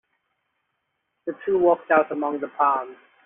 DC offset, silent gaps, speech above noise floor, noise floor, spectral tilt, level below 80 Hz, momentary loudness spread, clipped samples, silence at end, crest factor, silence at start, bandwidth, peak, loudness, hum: under 0.1%; none; 55 dB; -76 dBFS; -4.5 dB/octave; -68 dBFS; 15 LU; under 0.1%; 0.3 s; 20 dB; 1.25 s; 3.7 kHz; -4 dBFS; -22 LUFS; none